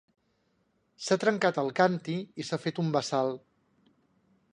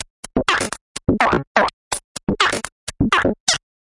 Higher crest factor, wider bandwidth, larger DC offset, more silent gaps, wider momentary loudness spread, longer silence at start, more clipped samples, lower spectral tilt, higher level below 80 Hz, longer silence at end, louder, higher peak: first, 22 dB vs 16 dB; about the same, 10.5 kHz vs 11.5 kHz; neither; second, none vs 0.10-0.23 s, 0.81-0.95 s, 1.47-1.55 s, 1.73-1.91 s, 2.04-2.15 s, 2.72-2.87 s, 3.40-3.47 s; about the same, 9 LU vs 9 LU; first, 1 s vs 0 s; neither; first, -5 dB/octave vs -3.5 dB/octave; second, -76 dBFS vs -40 dBFS; first, 1.15 s vs 0.25 s; second, -29 LUFS vs -19 LUFS; second, -10 dBFS vs -4 dBFS